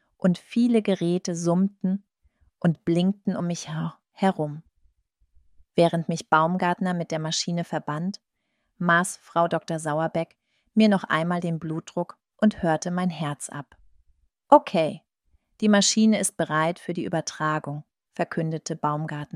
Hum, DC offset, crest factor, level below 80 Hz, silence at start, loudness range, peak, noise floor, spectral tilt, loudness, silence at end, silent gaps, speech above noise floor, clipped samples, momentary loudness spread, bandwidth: none; under 0.1%; 24 dB; -64 dBFS; 0.25 s; 5 LU; -2 dBFS; -76 dBFS; -5 dB/octave; -25 LUFS; 0.1 s; none; 52 dB; under 0.1%; 12 LU; 13.5 kHz